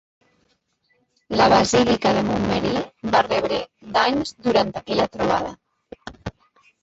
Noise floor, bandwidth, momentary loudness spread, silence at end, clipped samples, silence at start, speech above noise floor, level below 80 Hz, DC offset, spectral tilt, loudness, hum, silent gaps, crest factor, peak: -67 dBFS; 8 kHz; 19 LU; 0.5 s; under 0.1%; 1.3 s; 47 dB; -48 dBFS; under 0.1%; -4.5 dB/octave; -20 LUFS; none; none; 18 dB; -4 dBFS